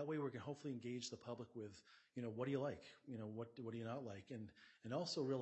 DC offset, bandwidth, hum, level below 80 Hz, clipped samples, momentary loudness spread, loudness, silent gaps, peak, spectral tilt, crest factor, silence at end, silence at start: under 0.1%; 8.2 kHz; none; -86 dBFS; under 0.1%; 13 LU; -49 LUFS; none; -30 dBFS; -5.5 dB/octave; 16 dB; 0 s; 0 s